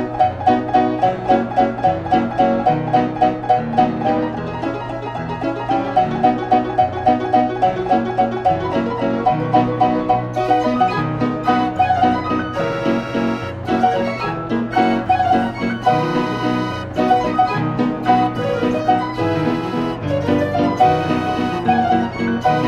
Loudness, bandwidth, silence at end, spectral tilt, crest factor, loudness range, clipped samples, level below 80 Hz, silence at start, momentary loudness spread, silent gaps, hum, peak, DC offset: -18 LUFS; 8.8 kHz; 0 s; -7.5 dB/octave; 16 dB; 2 LU; under 0.1%; -44 dBFS; 0 s; 6 LU; none; none; -2 dBFS; under 0.1%